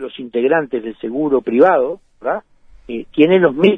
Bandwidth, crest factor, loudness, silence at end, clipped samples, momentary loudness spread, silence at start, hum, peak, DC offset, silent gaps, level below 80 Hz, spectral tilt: 3.9 kHz; 16 dB; -16 LUFS; 0 s; under 0.1%; 13 LU; 0 s; none; 0 dBFS; under 0.1%; none; -52 dBFS; -8.5 dB/octave